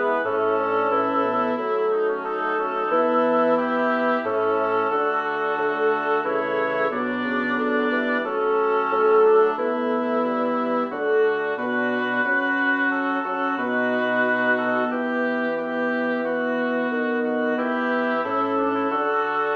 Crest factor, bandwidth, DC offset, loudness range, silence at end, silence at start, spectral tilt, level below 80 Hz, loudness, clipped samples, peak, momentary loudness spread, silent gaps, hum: 14 dB; 6.2 kHz; under 0.1%; 2 LU; 0 s; 0 s; -6.5 dB/octave; -70 dBFS; -22 LUFS; under 0.1%; -8 dBFS; 4 LU; none; none